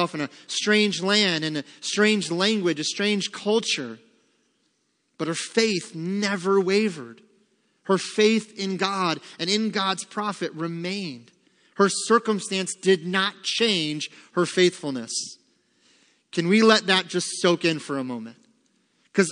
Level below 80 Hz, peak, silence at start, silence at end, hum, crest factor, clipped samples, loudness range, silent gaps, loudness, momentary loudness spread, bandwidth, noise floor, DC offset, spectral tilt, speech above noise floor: -78 dBFS; -2 dBFS; 0 s; 0 s; none; 24 dB; under 0.1%; 4 LU; none; -23 LUFS; 10 LU; 10.5 kHz; -71 dBFS; under 0.1%; -3.5 dB/octave; 47 dB